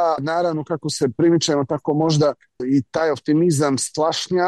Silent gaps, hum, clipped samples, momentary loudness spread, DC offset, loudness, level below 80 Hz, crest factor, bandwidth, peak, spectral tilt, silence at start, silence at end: none; none; under 0.1%; 5 LU; under 0.1%; -20 LUFS; -60 dBFS; 12 dB; 12.5 kHz; -8 dBFS; -5 dB/octave; 0 s; 0 s